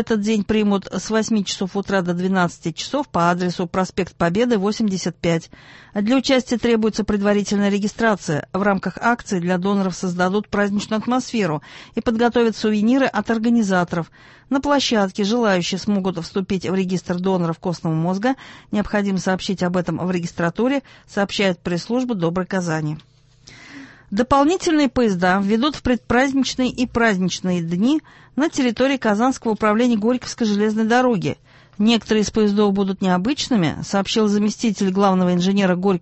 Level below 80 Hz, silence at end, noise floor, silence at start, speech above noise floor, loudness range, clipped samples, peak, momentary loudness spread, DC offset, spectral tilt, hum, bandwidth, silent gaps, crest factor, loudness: -48 dBFS; 0 s; -47 dBFS; 0 s; 27 dB; 3 LU; under 0.1%; -2 dBFS; 7 LU; under 0.1%; -5.5 dB/octave; none; 8.4 kHz; none; 18 dB; -20 LUFS